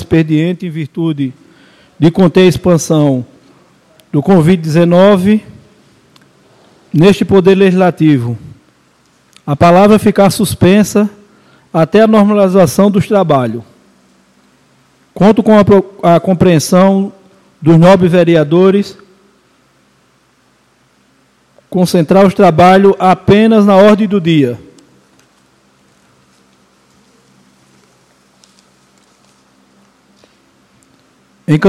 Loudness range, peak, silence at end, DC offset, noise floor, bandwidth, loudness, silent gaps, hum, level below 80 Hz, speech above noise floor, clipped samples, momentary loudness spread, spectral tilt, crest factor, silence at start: 5 LU; 0 dBFS; 0 s; under 0.1%; -52 dBFS; 14.5 kHz; -9 LUFS; none; none; -44 dBFS; 44 dB; 0.8%; 12 LU; -7 dB/octave; 10 dB; 0 s